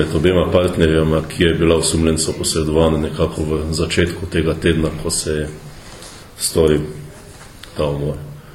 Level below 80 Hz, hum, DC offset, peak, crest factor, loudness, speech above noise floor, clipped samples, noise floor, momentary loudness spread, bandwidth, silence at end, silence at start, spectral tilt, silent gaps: -32 dBFS; none; under 0.1%; 0 dBFS; 18 dB; -17 LUFS; 21 dB; under 0.1%; -38 dBFS; 20 LU; 16.5 kHz; 0.05 s; 0 s; -5 dB/octave; none